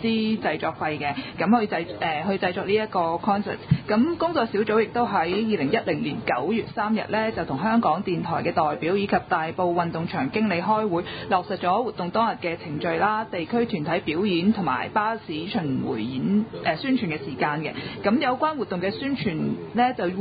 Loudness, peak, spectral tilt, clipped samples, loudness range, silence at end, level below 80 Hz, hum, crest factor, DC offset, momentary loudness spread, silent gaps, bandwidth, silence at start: -24 LUFS; -6 dBFS; -11 dB/octave; under 0.1%; 2 LU; 0 s; -54 dBFS; none; 18 dB; under 0.1%; 5 LU; none; 5 kHz; 0 s